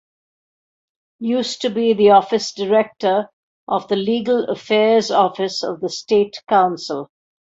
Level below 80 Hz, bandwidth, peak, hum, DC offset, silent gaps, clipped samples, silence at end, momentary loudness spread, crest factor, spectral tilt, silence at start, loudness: -64 dBFS; 8 kHz; -2 dBFS; none; under 0.1%; 3.33-3.67 s; under 0.1%; 0.55 s; 10 LU; 16 dB; -4.5 dB/octave; 1.2 s; -18 LUFS